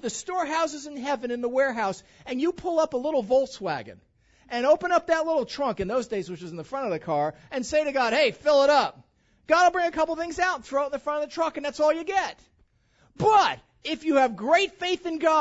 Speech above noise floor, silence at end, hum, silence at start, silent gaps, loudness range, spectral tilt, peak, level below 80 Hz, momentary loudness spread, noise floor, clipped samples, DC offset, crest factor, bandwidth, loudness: 39 dB; 0 s; none; 0 s; none; 4 LU; -4 dB/octave; -8 dBFS; -58 dBFS; 11 LU; -64 dBFS; under 0.1%; under 0.1%; 18 dB; 8 kHz; -25 LUFS